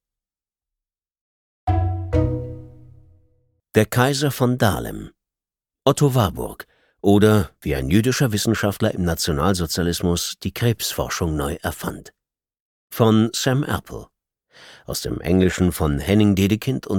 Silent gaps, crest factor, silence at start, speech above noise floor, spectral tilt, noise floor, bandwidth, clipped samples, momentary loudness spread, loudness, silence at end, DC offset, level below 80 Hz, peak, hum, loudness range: 12.60-12.88 s; 20 dB; 1.65 s; over 70 dB; -5.5 dB/octave; under -90 dBFS; 18.5 kHz; under 0.1%; 13 LU; -20 LUFS; 0 s; under 0.1%; -38 dBFS; -2 dBFS; none; 5 LU